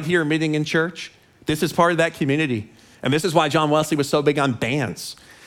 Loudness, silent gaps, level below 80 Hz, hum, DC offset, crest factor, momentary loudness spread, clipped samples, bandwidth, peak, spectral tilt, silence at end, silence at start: -21 LUFS; none; -56 dBFS; none; under 0.1%; 18 dB; 11 LU; under 0.1%; 17.5 kHz; -2 dBFS; -5 dB/octave; 0.35 s; 0 s